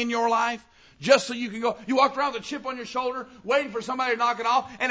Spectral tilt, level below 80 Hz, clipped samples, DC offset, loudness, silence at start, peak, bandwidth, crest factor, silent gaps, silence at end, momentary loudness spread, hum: -3 dB/octave; -66 dBFS; under 0.1%; under 0.1%; -25 LUFS; 0 s; -4 dBFS; 8 kHz; 20 dB; none; 0 s; 11 LU; none